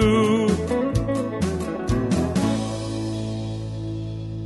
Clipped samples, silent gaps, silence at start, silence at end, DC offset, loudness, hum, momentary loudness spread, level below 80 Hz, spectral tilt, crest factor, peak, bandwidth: under 0.1%; none; 0 s; 0 s; under 0.1%; -24 LUFS; none; 10 LU; -36 dBFS; -6.5 dB/octave; 16 dB; -8 dBFS; 11.5 kHz